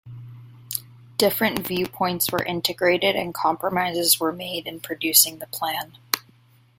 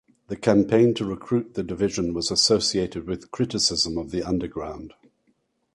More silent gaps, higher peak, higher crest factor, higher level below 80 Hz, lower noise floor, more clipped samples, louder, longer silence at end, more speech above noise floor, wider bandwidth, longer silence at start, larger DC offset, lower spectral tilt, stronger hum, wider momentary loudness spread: neither; first, 0 dBFS vs -4 dBFS; about the same, 24 dB vs 20 dB; second, -60 dBFS vs -48 dBFS; second, -56 dBFS vs -69 dBFS; neither; about the same, -22 LUFS vs -23 LUFS; second, 0.6 s vs 0.85 s; second, 33 dB vs 45 dB; first, 16.5 kHz vs 11.5 kHz; second, 0.05 s vs 0.3 s; neither; second, -2.5 dB/octave vs -4.5 dB/octave; neither; about the same, 14 LU vs 13 LU